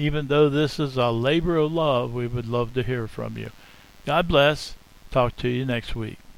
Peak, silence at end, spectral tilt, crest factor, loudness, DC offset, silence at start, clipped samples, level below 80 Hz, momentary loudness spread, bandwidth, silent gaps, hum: -6 dBFS; 0.05 s; -6.5 dB/octave; 18 dB; -23 LUFS; under 0.1%; 0 s; under 0.1%; -40 dBFS; 14 LU; 16 kHz; none; none